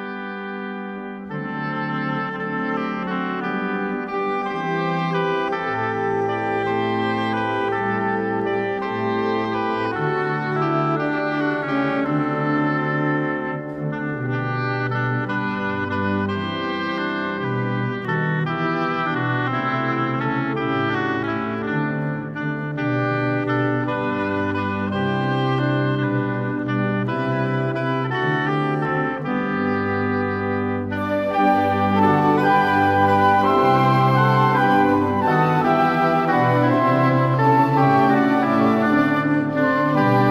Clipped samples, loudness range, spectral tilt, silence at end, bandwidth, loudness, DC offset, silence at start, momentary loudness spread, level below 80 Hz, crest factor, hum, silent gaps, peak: under 0.1%; 7 LU; -8 dB/octave; 0 s; 12.5 kHz; -21 LUFS; under 0.1%; 0 s; 8 LU; -56 dBFS; 16 dB; none; none; -6 dBFS